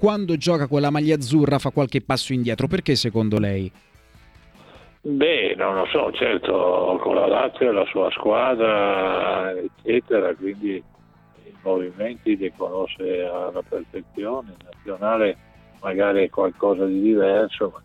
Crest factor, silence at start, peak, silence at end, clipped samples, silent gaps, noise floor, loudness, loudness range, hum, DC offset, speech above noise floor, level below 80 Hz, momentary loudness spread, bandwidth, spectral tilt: 16 dB; 0 s; -6 dBFS; 0.05 s; under 0.1%; none; -52 dBFS; -22 LUFS; 7 LU; none; under 0.1%; 31 dB; -52 dBFS; 10 LU; 13 kHz; -6 dB/octave